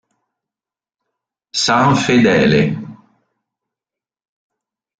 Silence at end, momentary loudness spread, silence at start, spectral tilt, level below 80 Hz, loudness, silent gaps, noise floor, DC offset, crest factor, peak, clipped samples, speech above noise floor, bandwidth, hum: 2.05 s; 10 LU; 1.55 s; -5 dB/octave; -50 dBFS; -14 LUFS; none; -90 dBFS; under 0.1%; 18 dB; -2 dBFS; under 0.1%; 77 dB; 9.4 kHz; none